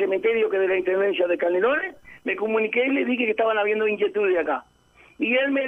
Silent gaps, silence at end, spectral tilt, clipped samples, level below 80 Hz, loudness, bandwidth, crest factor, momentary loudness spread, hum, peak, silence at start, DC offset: none; 0 s; -6.5 dB/octave; under 0.1%; -64 dBFS; -22 LUFS; 3.8 kHz; 14 dB; 6 LU; none; -10 dBFS; 0 s; under 0.1%